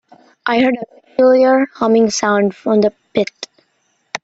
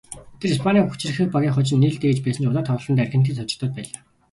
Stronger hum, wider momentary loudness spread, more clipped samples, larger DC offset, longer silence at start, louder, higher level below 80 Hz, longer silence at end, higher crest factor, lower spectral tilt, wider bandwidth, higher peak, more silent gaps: neither; first, 13 LU vs 10 LU; neither; neither; first, 0.45 s vs 0.1 s; first, -15 LUFS vs -21 LUFS; second, -60 dBFS vs -54 dBFS; second, 0.05 s vs 0.45 s; about the same, 14 dB vs 16 dB; second, -4.5 dB/octave vs -6.5 dB/octave; second, 8 kHz vs 11.5 kHz; first, -2 dBFS vs -6 dBFS; neither